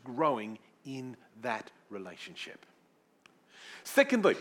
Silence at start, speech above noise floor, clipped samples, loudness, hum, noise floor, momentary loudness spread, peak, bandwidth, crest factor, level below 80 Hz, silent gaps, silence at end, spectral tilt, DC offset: 0.05 s; 36 dB; under 0.1%; -32 LUFS; none; -68 dBFS; 20 LU; -10 dBFS; 18 kHz; 24 dB; under -90 dBFS; none; 0 s; -4.5 dB/octave; under 0.1%